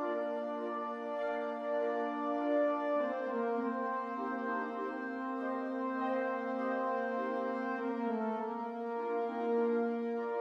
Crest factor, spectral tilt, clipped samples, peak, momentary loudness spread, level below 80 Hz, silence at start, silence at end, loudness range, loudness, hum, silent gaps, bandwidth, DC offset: 12 dB; -7 dB/octave; under 0.1%; -22 dBFS; 6 LU; -86 dBFS; 0 s; 0 s; 2 LU; -36 LUFS; none; none; 6.8 kHz; under 0.1%